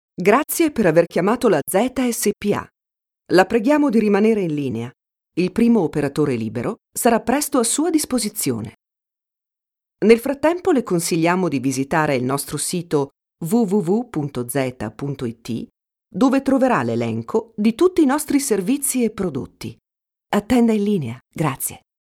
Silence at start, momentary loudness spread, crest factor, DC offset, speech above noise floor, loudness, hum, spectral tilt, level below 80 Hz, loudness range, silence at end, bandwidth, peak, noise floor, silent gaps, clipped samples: 0.2 s; 11 LU; 20 dB; under 0.1%; 68 dB; -19 LUFS; none; -5 dB/octave; -52 dBFS; 3 LU; 0.25 s; 17.5 kHz; 0 dBFS; -87 dBFS; none; under 0.1%